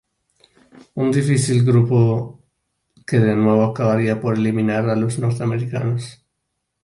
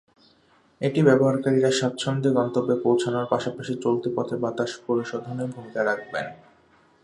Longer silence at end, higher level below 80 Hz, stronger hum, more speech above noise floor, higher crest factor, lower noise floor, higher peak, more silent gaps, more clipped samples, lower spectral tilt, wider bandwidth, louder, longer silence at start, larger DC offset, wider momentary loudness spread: about the same, 0.7 s vs 0.7 s; first, -54 dBFS vs -66 dBFS; neither; first, 58 dB vs 37 dB; about the same, 16 dB vs 20 dB; first, -75 dBFS vs -60 dBFS; about the same, -4 dBFS vs -4 dBFS; neither; neither; first, -7.5 dB/octave vs -6 dB/octave; about the same, 11.5 kHz vs 11 kHz; first, -18 LUFS vs -24 LUFS; first, 0.95 s vs 0.8 s; neither; about the same, 10 LU vs 11 LU